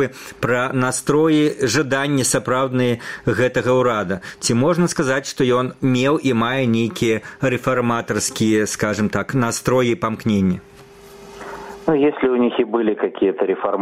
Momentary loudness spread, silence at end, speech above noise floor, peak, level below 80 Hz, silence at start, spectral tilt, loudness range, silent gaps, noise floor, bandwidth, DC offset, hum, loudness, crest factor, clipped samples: 5 LU; 0 s; 24 dB; -2 dBFS; -52 dBFS; 0 s; -5 dB/octave; 2 LU; none; -42 dBFS; 16 kHz; 0.2%; none; -19 LUFS; 16 dB; under 0.1%